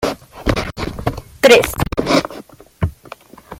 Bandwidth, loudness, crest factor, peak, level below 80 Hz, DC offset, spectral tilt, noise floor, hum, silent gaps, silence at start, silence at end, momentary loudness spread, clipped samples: 16.5 kHz; -17 LUFS; 18 dB; 0 dBFS; -34 dBFS; under 0.1%; -4.5 dB/octave; -39 dBFS; none; none; 0 s; 0 s; 15 LU; under 0.1%